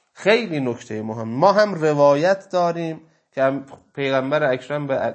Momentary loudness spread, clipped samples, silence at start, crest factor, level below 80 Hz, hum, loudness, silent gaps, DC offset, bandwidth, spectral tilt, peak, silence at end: 13 LU; under 0.1%; 0.2 s; 18 dB; -70 dBFS; none; -20 LUFS; none; under 0.1%; 8.6 kHz; -6 dB/octave; -2 dBFS; 0 s